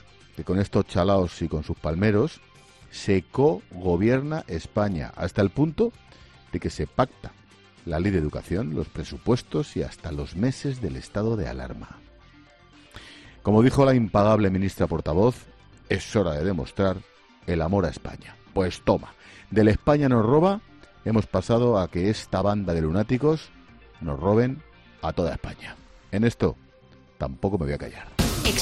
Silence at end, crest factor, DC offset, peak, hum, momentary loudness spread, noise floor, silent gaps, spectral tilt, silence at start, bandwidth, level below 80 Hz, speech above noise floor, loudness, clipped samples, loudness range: 0 s; 20 dB; under 0.1%; -6 dBFS; none; 16 LU; -53 dBFS; none; -6.5 dB/octave; 0.35 s; 11.5 kHz; -42 dBFS; 30 dB; -25 LUFS; under 0.1%; 6 LU